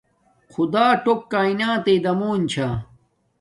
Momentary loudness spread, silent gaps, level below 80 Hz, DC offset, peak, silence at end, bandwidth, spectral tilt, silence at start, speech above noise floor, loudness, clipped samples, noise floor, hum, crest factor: 9 LU; none; -52 dBFS; under 0.1%; -4 dBFS; 0.55 s; 11.5 kHz; -6 dB/octave; 0.6 s; 37 dB; -20 LUFS; under 0.1%; -57 dBFS; none; 16 dB